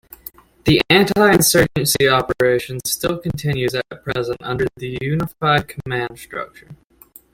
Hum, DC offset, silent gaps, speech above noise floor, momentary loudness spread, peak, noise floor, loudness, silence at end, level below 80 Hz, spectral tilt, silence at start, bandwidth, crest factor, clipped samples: none; under 0.1%; none; 30 dB; 16 LU; -2 dBFS; -48 dBFS; -17 LUFS; 0.6 s; -44 dBFS; -4 dB/octave; 0.65 s; 17 kHz; 18 dB; under 0.1%